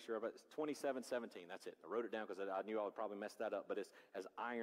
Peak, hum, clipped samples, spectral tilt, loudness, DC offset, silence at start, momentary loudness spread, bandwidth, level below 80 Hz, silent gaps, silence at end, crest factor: -32 dBFS; none; under 0.1%; -4.5 dB/octave; -47 LUFS; under 0.1%; 0 s; 9 LU; 16 kHz; under -90 dBFS; none; 0 s; 14 dB